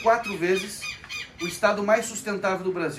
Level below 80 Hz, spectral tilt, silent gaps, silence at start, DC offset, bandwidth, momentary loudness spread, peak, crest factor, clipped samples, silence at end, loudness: -58 dBFS; -4 dB/octave; none; 0 s; under 0.1%; 15.5 kHz; 10 LU; -8 dBFS; 18 dB; under 0.1%; 0 s; -26 LUFS